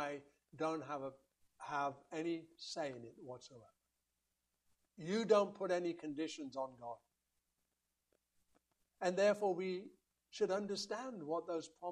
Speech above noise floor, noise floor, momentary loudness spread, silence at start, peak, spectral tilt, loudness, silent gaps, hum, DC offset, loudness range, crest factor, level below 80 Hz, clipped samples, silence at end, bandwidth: 47 dB; -87 dBFS; 19 LU; 0 s; -18 dBFS; -5 dB/octave; -40 LUFS; none; none; under 0.1%; 7 LU; 24 dB; -86 dBFS; under 0.1%; 0 s; 12 kHz